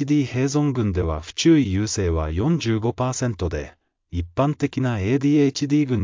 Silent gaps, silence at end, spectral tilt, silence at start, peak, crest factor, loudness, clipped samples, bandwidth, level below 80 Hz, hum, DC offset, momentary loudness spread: none; 0 s; -6 dB/octave; 0 s; -6 dBFS; 16 dB; -22 LUFS; under 0.1%; 7.6 kHz; -36 dBFS; none; under 0.1%; 10 LU